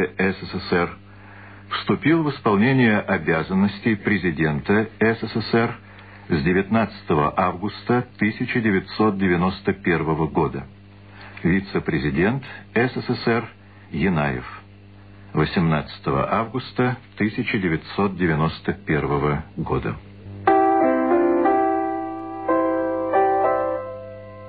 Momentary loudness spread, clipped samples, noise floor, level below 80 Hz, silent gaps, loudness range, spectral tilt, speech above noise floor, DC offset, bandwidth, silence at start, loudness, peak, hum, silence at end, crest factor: 10 LU; under 0.1%; -45 dBFS; -46 dBFS; none; 4 LU; -11 dB/octave; 24 dB; 0.2%; 4.9 kHz; 0 s; -22 LUFS; -4 dBFS; 50 Hz at -45 dBFS; 0 s; 18 dB